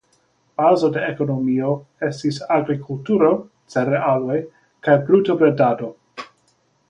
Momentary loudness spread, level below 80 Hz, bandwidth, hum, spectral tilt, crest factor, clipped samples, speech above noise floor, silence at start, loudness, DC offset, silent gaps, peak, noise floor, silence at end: 12 LU; -62 dBFS; 10 kHz; none; -7.5 dB/octave; 18 dB; under 0.1%; 44 dB; 0.6 s; -19 LUFS; under 0.1%; none; -2 dBFS; -63 dBFS; 0.65 s